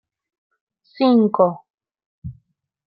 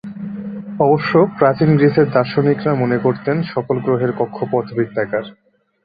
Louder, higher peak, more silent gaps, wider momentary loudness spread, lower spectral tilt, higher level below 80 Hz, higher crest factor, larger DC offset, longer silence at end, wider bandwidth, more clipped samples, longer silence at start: about the same, -17 LUFS vs -16 LUFS; about the same, -2 dBFS vs -2 dBFS; first, 1.70-1.78 s, 2.06-2.22 s vs none; first, 23 LU vs 14 LU; about the same, -11.5 dB/octave vs -10.5 dB/octave; about the same, -56 dBFS vs -56 dBFS; about the same, 20 dB vs 16 dB; neither; first, 0.65 s vs 0.5 s; about the same, 5.2 kHz vs 5 kHz; neither; first, 1 s vs 0.05 s